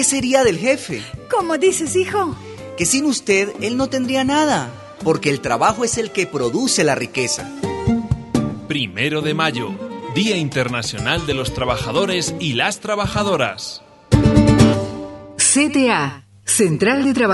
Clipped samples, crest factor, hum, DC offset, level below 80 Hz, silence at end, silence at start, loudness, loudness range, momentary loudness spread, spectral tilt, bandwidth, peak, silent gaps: under 0.1%; 18 dB; none; under 0.1%; -36 dBFS; 0 s; 0 s; -18 LUFS; 4 LU; 11 LU; -4 dB/octave; 12 kHz; 0 dBFS; none